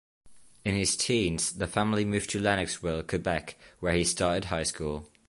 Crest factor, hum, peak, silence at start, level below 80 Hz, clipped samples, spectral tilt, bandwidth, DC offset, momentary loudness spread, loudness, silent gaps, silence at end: 20 dB; none; -10 dBFS; 0.25 s; -48 dBFS; under 0.1%; -4 dB/octave; 11.5 kHz; under 0.1%; 8 LU; -29 LUFS; none; 0.25 s